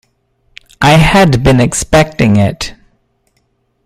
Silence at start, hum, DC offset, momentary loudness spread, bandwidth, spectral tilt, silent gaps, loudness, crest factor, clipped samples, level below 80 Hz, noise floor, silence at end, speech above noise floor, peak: 0.8 s; none; under 0.1%; 9 LU; 15 kHz; -5.5 dB/octave; none; -9 LUFS; 12 dB; under 0.1%; -28 dBFS; -60 dBFS; 1.15 s; 51 dB; 0 dBFS